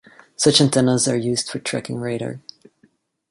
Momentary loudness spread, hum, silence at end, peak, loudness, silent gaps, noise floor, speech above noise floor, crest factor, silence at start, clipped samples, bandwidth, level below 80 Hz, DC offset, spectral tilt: 13 LU; none; 0.9 s; -2 dBFS; -19 LUFS; none; -61 dBFS; 41 dB; 20 dB; 0.4 s; under 0.1%; 11.5 kHz; -58 dBFS; under 0.1%; -4 dB/octave